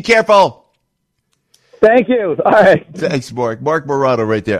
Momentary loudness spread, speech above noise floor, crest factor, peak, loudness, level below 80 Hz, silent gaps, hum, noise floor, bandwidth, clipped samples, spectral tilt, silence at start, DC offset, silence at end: 9 LU; 56 dB; 14 dB; 0 dBFS; -13 LUFS; -50 dBFS; none; none; -69 dBFS; 12 kHz; under 0.1%; -5.5 dB/octave; 0.05 s; under 0.1%; 0 s